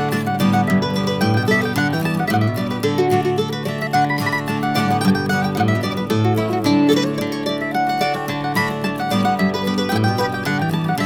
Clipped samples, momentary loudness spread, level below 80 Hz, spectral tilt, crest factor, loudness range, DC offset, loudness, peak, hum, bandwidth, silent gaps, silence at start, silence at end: under 0.1%; 4 LU; -50 dBFS; -6 dB/octave; 14 dB; 1 LU; under 0.1%; -19 LUFS; -4 dBFS; none; 19 kHz; none; 0 s; 0 s